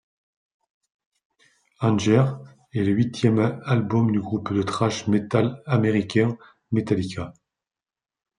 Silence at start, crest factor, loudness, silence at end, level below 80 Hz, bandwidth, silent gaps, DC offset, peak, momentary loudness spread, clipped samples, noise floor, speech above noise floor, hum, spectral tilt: 1.8 s; 18 dB; -23 LUFS; 1.1 s; -62 dBFS; 10.5 kHz; none; under 0.1%; -6 dBFS; 8 LU; under 0.1%; under -90 dBFS; over 68 dB; none; -7 dB/octave